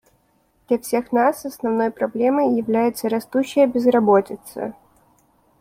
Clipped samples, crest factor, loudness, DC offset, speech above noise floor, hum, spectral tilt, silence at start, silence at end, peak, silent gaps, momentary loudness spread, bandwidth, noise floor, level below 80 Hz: under 0.1%; 16 dB; -20 LUFS; under 0.1%; 43 dB; none; -6 dB/octave; 0.7 s; 0.9 s; -4 dBFS; none; 13 LU; 16.5 kHz; -62 dBFS; -62 dBFS